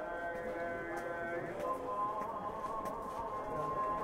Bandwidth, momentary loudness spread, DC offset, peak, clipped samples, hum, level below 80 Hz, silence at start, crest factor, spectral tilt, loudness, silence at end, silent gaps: 16 kHz; 4 LU; under 0.1%; -26 dBFS; under 0.1%; none; -60 dBFS; 0 s; 14 dB; -6 dB/octave; -40 LUFS; 0 s; none